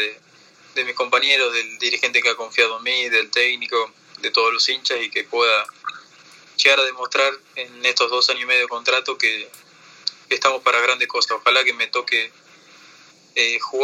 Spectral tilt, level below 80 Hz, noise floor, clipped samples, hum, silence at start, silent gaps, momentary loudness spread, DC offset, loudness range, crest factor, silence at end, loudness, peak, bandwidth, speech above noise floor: 1 dB/octave; -86 dBFS; -51 dBFS; under 0.1%; none; 0 s; none; 12 LU; under 0.1%; 2 LU; 22 dB; 0 s; -18 LUFS; 0 dBFS; 15.5 kHz; 31 dB